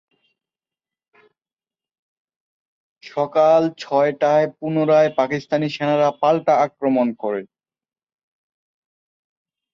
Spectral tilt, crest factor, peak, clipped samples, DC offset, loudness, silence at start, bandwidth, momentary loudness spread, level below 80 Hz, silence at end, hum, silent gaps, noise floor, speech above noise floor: -7 dB/octave; 18 dB; -4 dBFS; under 0.1%; under 0.1%; -19 LUFS; 3.05 s; 7.2 kHz; 8 LU; -68 dBFS; 2.3 s; none; none; under -90 dBFS; over 72 dB